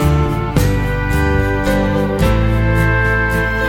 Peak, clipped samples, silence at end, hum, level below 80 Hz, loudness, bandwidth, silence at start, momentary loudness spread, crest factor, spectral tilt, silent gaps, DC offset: 0 dBFS; under 0.1%; 0 s; none; -20 dBFS; -15 LUFS; 17.5 kHz; 0 s; 3 LU; 14 dB; -6.5 dB/octave; none; under 0.1%